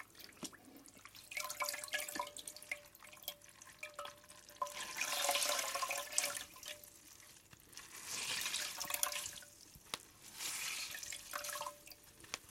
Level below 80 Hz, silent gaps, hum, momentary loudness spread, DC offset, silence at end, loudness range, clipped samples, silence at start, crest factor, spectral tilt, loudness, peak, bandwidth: -76 dBFS; none; none; 20 LU; under 0.1%; 0 s; 6 LU; under 0.1%; 0 s; 30 dB; 0.5 dB/octave; -41 LUFS; -14 dBFS; 16.5 kHz